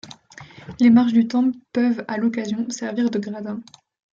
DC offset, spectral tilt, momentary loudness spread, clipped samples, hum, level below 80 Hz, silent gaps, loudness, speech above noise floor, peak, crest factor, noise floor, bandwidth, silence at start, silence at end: under 0.1%; -5.5 dB/octave; 22 LU; under 0.1%; none; -62 dBFS; none; -20 LUFS; 24 dB; -6 dBFS; 16 dB; -44 dBFS; 7.8 kHz; 0.05 s; 0.5 s